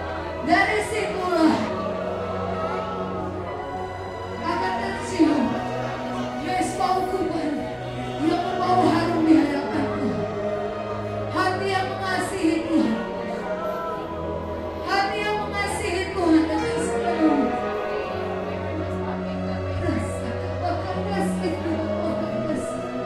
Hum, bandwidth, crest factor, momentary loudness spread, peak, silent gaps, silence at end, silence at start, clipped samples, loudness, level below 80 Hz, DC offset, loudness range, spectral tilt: none; 13 kHz; 18 dB; 9 LU; -6 dBFS; none; 0 s; 0 s; under 0.1%; -24 LUFS; -46 dBFS; under 0.1%; 4 LU; -6 dB/octave